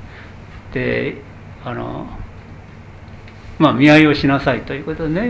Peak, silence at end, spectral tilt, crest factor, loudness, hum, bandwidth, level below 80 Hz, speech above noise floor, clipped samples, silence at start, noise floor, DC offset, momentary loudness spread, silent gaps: 0 dBFS; 0 s; -7 dB/octave; 18 dB; -16 LUFS; none; 8 kHz; -38 dBFS; 22 dB; under 0.1%; 0 s; -37 dBFS; under 0.1%; 28 LU; none